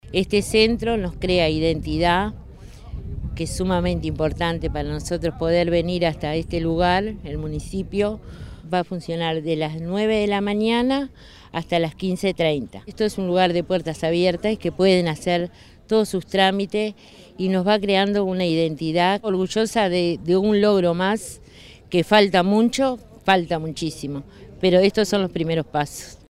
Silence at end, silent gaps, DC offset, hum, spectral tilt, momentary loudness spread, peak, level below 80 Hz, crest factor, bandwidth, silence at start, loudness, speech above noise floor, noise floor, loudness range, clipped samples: 0.15 s; none; under 0.1%; none; -5.5 dB/octave; 11 LU; -2 dBFS; -40 dBFS; 18 dB; 15 kHz; 0.05 s; -21 LUFS; 24 dB; -45 dBFS; 4 LU; under 0.1%